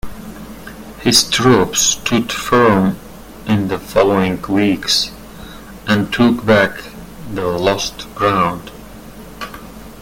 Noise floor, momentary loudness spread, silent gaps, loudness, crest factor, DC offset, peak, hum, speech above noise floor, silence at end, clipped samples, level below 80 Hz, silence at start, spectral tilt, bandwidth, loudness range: -34 dBFS; 22 LU; none; -15 LUFS; 16 dB; under 0.1%; 0 dBFS; none; 20 dB; 0 s; under 0.1%; -40 dBFS; 0.05 s; -4 dB/octave; 17 kHz; 4 LU